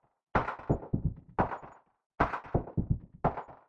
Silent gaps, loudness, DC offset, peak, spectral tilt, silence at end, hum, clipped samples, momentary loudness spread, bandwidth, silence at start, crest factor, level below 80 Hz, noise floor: 2.06-2.10 s; -34 LUFS; under 0.1%; -12 dBFS; -9.5 dB/octave; 0.15 s; none; under 0.1%; 4 LU; 7.4 kHz; 0.35 s; 22 dB; -44 dBFS; -52 dBFS